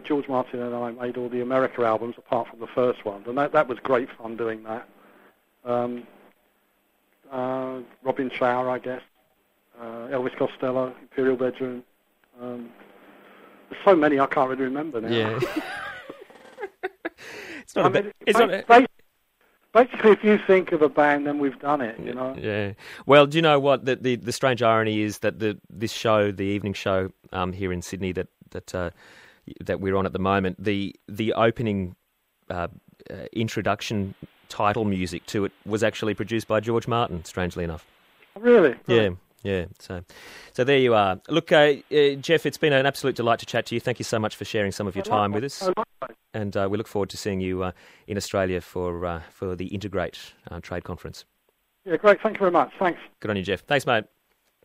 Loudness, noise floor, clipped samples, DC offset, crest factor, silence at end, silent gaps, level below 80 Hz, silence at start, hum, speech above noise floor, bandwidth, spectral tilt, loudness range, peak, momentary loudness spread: -24 LUFS; -70 dBFS; under 0.1%; under 0.1%; 22 dB; 0.6 s; none; -56 dBFS; 0.05 s; none; 46 dB; 16 kHz; -5.5 dB/octave; 9 LU; -2 dBFS; 17 LU